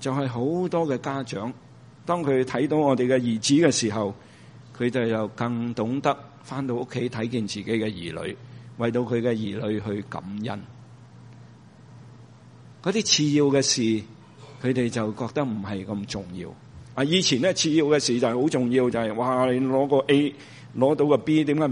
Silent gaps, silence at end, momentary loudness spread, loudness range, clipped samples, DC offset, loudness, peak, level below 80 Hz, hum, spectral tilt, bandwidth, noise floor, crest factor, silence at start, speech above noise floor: none; 0 s; 13 LU; 7 LU; under 0.1%; under 0.1%; -24 LUFS; -6 dBFS; -62 dBFS; none; -4.5 dB/octave; 10.5 kHz; -48 dBFS; 20 dB; 0 s; 25 dB